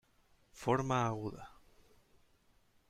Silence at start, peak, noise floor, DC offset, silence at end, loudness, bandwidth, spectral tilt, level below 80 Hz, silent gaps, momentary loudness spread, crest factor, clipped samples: 0.55 s; -18 dBFS; -70 dBFS; under 0.1%; 1.4 s; -36 LUFS; 14.5 kHz; -6.5 dB/octave; -66 dBFS; none; 20 LU; 22 dB; under 0.1%